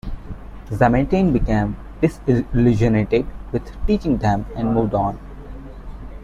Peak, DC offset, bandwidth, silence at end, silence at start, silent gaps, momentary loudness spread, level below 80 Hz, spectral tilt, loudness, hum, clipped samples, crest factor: -2 dBFS; under 0.1%; 11 kHz; 0 s; 0.05 s; none; 21 LU; -30 dBFS; -8.5 dB/octave; -20 LUFS; none; under 0.1%; 16 dB